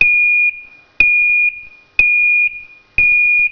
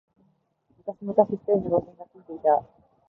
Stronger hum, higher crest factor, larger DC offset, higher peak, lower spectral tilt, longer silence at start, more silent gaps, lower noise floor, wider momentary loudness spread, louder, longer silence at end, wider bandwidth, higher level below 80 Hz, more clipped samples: neither; second, 14 dB vs 22 dB; neither; first, 0 dBFS vs -4 dBFS; second, -3 dB/octave vs -12 dB/octave; second, 0 s vs 0.85 s; neither; second, -36 dBFS vs -68 dBFS; second, 8 LU vs 17 LU; first, -11 LUFS vs -25 LUFS; second, 0 s vs 0.45 s; first, 5.4 kHz vs 2.5 kHz; first, -40 dBFS vs -62 dBFS; first, 0.1% vs under 0.1%